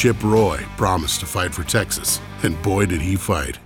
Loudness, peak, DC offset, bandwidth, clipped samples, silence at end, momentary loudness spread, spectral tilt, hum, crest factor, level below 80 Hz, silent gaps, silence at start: -20 LUFS; -2 dBFS; under 0.1%; 17.5 kHz; under 0.1%; 0.05 s; 5 LU; -4.5 dB/octave; none; 18 dB; -34 dBFS; none; 0 s